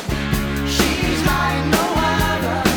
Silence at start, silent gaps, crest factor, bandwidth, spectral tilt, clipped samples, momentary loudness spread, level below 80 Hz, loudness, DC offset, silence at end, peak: 0 s; none; 16 dB; over 20 kHz; -4.5 dB/octave; under 0.1%; 4 LU; -28 dBFS; -18 LUFS; under 0.1%; 0 s; -2 dBFS